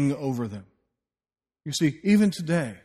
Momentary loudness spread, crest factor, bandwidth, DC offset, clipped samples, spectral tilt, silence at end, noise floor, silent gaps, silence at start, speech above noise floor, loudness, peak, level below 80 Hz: 16 LU; 16 dB; 13.5 kHz; under 0.1%; under 0.1%; -6 dB/octave; 0.05 s; under -90 dBFS; none; 0 s; over 66 dB; -25 LUFS; -10 dBFS; -62 dBFS